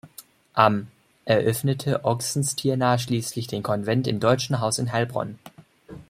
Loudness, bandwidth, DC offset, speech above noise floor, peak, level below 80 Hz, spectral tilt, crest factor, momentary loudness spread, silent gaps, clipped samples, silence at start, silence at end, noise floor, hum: -24 LUFS; 16 kHz; under 0.1%; 26 dB; -2 dBFS; -60 dBFS; -5 dB/octave; 22 dB; 9 LU; none; under 0.1%; 0.05 s; 0.05 s; -49 dBFS; none